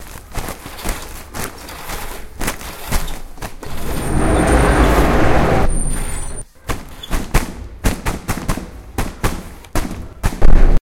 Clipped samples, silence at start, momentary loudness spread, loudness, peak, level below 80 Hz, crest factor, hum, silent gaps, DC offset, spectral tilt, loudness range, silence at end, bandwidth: 0.5%; 0 s; 16 LU; -20 LUFS; 0 dBFS; -18 dBFS; 16 dB; none; none; under 0.1%; -5 dB/octave; 10 LU; 0.05 s; 16.5 kHz